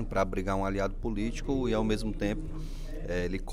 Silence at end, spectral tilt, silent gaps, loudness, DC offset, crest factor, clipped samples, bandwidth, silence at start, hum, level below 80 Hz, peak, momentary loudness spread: 0 s; -6.5 dB/octave; none; -32 LUFS; under 0.1%; 16 dB; under 0.1%; 12 kHz; 0 s; none; -36 dBFS; -14 dBFS; 11 LU